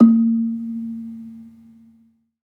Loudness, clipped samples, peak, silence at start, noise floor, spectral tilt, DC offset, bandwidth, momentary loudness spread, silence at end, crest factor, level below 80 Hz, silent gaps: -20 LUFS; under 0.1%; -2 dBFS; 0 s; -57 dBFS; -11.5 dB/octave; under 0.1%; 1.5 kHz; 23 LU; 0.95 s; 18 dB; -76 dBFS; none